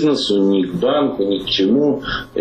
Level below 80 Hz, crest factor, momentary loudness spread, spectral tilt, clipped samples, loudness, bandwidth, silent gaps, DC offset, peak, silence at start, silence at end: -44 dBFS; 10 dB; 5 LU; -5.5 dB/octave; under 0.1%; -17 LUFS; 9.6 kHz; none; under 0.1%; -6 dBFS; 0 s; 0 s